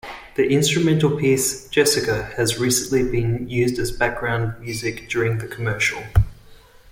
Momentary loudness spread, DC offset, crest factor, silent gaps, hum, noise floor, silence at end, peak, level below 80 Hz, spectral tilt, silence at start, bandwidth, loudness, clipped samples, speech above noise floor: 8 LU; under 0.1%; 18 dB; none; none; -46 dBFS; 0.35 s; -4 dBFS; -36 dBFS; -4.5 dB/octave; 0.05 s; 16.5 kHz; -21 LUFS; under 0.1%; 26 dB